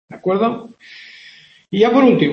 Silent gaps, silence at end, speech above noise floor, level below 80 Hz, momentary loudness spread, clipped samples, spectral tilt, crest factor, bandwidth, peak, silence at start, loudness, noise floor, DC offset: none; 0 s; 29 dB; -60 dBFS; 26 LU; under 0.1%; -7.5 dB/octave; 16 dB; 6.4 kHz; 0 dBFS; 0.1 s; -15 LUFS; -45 dBFS; under 0.1%